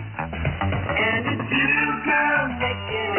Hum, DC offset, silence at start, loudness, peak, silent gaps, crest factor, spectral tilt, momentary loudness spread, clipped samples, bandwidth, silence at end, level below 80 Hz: none; under 0.1%; 0 s; -22 LUFS; -10 dBFS; none; 14 dB; -1.5 dB/octave; 7 LU; under 0.1%; 3.3 kHz; 0 s; -40 dBFS